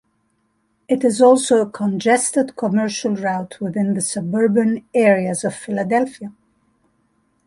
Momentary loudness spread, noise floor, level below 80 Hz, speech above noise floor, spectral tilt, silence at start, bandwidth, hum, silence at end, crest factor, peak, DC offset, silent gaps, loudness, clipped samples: 10 LU; -66 dBFS; -64 dBFS; 48 dB; -5 dB/octave; 0.9 s; 11.5 kHz; none; 1.15 s; 16 dB; -2 dBFS; under 0.1%; none; -18 LUFS; under 0.1%